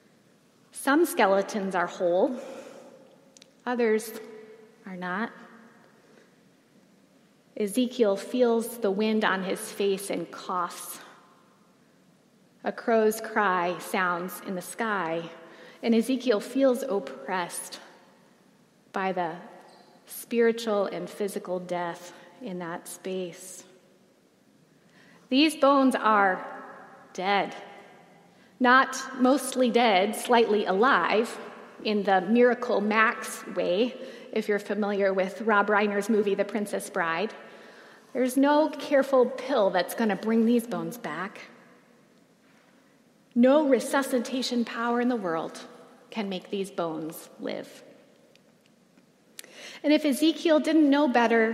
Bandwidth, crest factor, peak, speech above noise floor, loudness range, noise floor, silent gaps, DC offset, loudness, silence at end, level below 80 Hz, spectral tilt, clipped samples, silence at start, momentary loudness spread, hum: 16 kHz; 20 dB; -6 dBFS; 36 dB; 11 LU; -61 dBFS; none; under 0.1%; -26 LUFS; 0 s; -86 dBFS; -4.5 dB/octave; under 0.1%; 0.75 s; 19 LU; none